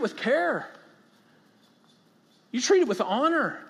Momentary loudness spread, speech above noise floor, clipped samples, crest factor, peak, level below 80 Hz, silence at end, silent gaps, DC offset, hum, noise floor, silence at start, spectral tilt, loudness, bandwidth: 11 LU; 37 dB; under 0.1%; 18 dB; -10 dBFS; -86 dBFS; 0 s; none; under 0.1%; none; -62 dBFS; 0 s; -3.5 dB/octave; -25 LUFS; 12.5 kHz